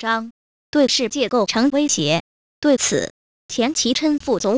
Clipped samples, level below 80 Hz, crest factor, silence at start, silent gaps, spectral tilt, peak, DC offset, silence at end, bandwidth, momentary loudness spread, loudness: under 0.1%; -56 dBFS; 12 dB; 0 s; 0.31-0.73 s, 2.20-2.62 s, 3.10-3.49 s; -3 dB/octave; -8 dBFS; under 0.1%; 0 s; 8 kHz; 7 LU; -19 LUFS